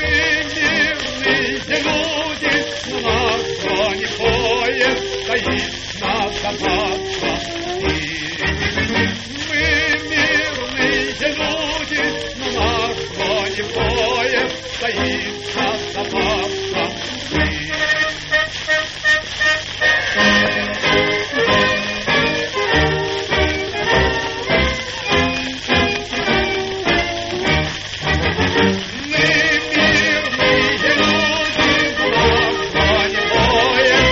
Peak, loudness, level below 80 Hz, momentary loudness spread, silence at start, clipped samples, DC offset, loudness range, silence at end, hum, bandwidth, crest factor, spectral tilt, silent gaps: -2 dBFS; -17 LUFS; -34 dBFS; 7 LU; 0 s; under 0.1%; under 0.1%; 5 LU; 0 s; 50 Hz at -40 dBFS; 8 kHz; 16 dB; -2 dB/octave; none